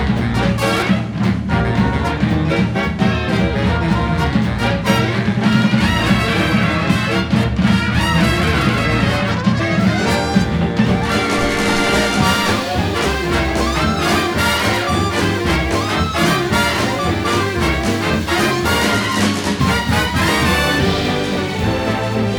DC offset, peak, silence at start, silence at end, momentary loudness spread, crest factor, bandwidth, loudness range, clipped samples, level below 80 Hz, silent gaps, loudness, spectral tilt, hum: 0.2%; 0 dBFS; 0 s; 0 s; 3 LU; 14 dB; 20 kHz; 1 LU; under 0.1%; -28 dBFS; none; -16 LUFS; -5 dB/octave; none